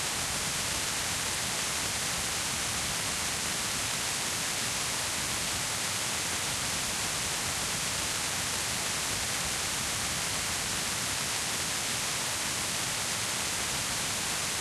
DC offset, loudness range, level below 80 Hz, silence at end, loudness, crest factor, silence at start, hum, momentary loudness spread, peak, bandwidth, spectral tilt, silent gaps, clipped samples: under 0.1%; 0 LU; -52 dBFS; 0 s; -29 LUFS; 16 dB; 0 s; none; 0 LU; -16 dBFS; 16 kHz; -1 dB/octave; none; under 0.1%